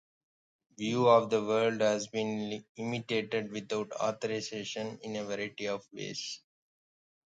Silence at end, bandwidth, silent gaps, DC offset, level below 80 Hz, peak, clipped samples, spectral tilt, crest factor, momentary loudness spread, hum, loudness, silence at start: 0.9 s; 9.2 kHz; 2.69-2.75 s; under 0.1%; -76 dBFS; -10 dBFS; under 0.1%; -4.5 dB/octave; 22 dB; 13 LU; none; -32 LUFS; 0.8 s